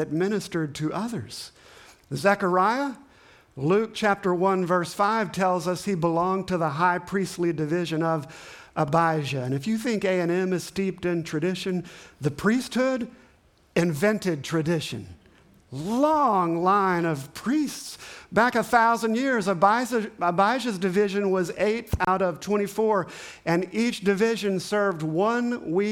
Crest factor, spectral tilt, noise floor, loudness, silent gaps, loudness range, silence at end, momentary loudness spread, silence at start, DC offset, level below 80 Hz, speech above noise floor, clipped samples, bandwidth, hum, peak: 20 dB; -5.5 dB/octave; -59 dBFS; -25 LUFS; none; 4 LU; 0 s; 10 LU; 0 s; under 0.1%; -54 dBFS; 35 dB; under 0.1%; 18 kHz; none; -6 dBFS